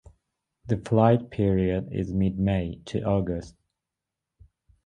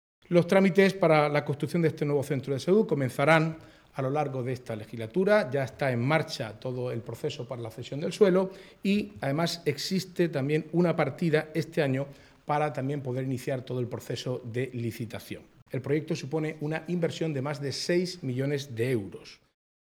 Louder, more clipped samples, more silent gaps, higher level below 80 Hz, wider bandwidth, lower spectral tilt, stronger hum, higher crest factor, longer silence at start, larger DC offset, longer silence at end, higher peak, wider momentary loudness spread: about the same, -26 LUFS vs -28 LUFS; neither; second, none vs 15.62-15.66 s; first, -44 dBFS vs -66 dBFS; second, 9.6 kHz vs 17 kHz; first, -9 dB/octave vs -6.5 dB/octave; neither; about the same, 22 dB vs 22 dB; first, 0.65 s vs 0.3 s; neither; first, 1.35 s vs 0.5 s; about the same, -4 dBFS vs -6 dBFS; second, 10 LU vs 13 LU